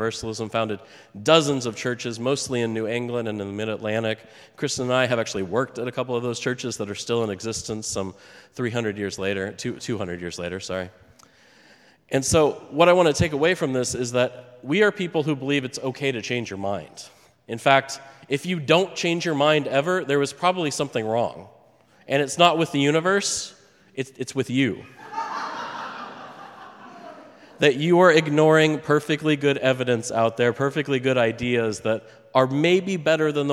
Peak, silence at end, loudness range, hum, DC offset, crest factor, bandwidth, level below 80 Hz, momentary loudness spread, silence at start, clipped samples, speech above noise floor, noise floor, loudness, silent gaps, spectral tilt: 0 dBFS; 0 s; 9 LU; none; under 0.1%; 22 dB; 15 kHz; -56 dBFS; 15 LU; 0 s; under 0.1%; 33 dB; -56 dBFS; -23 LUFS; none; -4.5 dB/octave